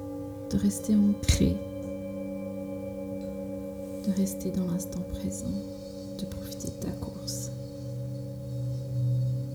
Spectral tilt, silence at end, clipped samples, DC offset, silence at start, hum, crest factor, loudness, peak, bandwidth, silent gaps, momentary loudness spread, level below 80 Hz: -6 dB/octave; 0 s; under 0.1%; under 0.1%; 0 s; none; 20 dB; -32 LUFS; -10 dBFS; over 20 kHz; none; 12 LU; -42 dBFS